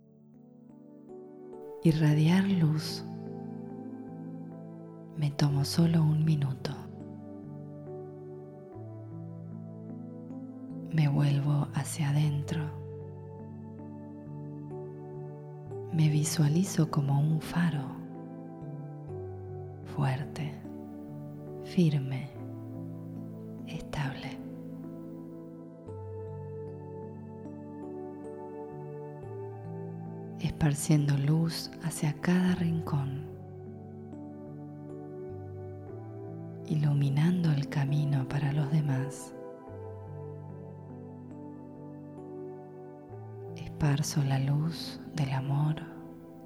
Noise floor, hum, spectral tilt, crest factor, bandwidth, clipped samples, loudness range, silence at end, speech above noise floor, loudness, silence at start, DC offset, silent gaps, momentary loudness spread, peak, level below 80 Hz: -55 dBFS; none; -6.5 dB/octave; 20 dB; 14 kHz; under 0.1%; 13 LU; 0 s; 28 dB; -32 LUFS; 0.25 s; under 0.1%; none; 18 LU; -12 dBFS; -60 dBFS